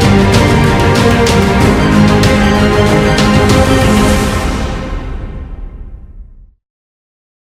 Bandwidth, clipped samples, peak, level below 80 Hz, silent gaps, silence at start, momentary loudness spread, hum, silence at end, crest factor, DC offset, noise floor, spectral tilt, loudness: 15.5 kHz; 0.7%; 0 dBFS; -20 dBFS; none; 0 s; 16 LU; none; 1.2 s; 10 dB; under 0.1%; -33 dBFS; -5.5 dB/octave; -9 LUFS